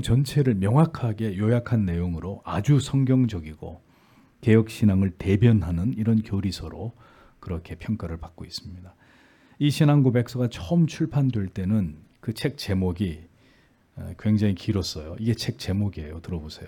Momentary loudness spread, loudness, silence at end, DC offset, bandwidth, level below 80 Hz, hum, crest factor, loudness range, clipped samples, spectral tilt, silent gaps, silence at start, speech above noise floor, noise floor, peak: 16 LU; -24 LUFS; 0 s; under 0.1%; 17.5 kHz; -48 dBFS; none; 18 dB; 6 LU; under 0.1%; -7.5 dB/octave; none; 0 s; 36 dB; -59 dBFS; -6 dBFS